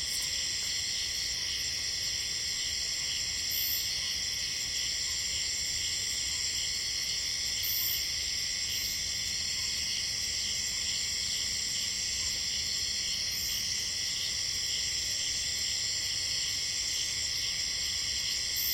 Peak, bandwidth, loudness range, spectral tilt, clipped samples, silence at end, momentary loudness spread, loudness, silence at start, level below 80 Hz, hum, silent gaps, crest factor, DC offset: -18 dBFS; 16.5 kHz; 1 LU; 1 dB/octave; under 0.1%; 0 s; 1 LU; -29 LUFS; 0 s; -54 dBFS; none; none; 16 dB; under 0.1%